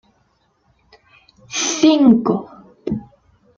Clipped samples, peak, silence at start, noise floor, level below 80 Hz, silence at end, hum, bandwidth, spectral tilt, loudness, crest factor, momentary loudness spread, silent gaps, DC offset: under 0.1%; -2 dBFS; 1.5 s; -62 dBFS; -54 dBFS; 0.55 s; none; 7.6 kHz; -4 dB/octave; -16 LUFS; 18 dB; 15 LU; none; under 0.1%